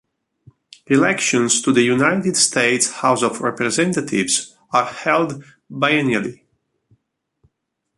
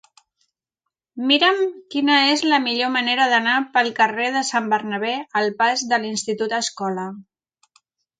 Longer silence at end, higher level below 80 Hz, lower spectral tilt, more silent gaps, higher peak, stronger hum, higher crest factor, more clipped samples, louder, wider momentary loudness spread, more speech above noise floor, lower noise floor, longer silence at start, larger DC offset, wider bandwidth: first, 1.65 s vs 0.95 s; first, -62 dBFS vs -76 dBFS; about the same, -3 dB/octave vs -2.5 dB/octave; neither; about the same, -2 dBFS vs -4 dBFS; neither; about the same, 18 dB vs 18 dB; neither; about the same, -17 LUFS vs -19 LUFS; second, 6 LU vs 9 LU; second, 58 dB vs 63 dB; second, -75 dBFS vs -83 dBFS; second, 0.9 s vs 1.15 s; neither; first, 11.5 kHz vs 9.4 kHz